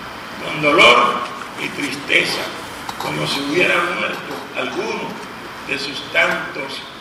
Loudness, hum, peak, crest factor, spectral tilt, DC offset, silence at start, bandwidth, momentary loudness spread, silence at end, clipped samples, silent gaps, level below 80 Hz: -17 LUFS; none; 0 dBFS; 20 dB; -3 dB/octave; under 0.1%; 0 s; 15.5 kHz; 17 LU; 0 s; under 0.1%; none; -54 dBFS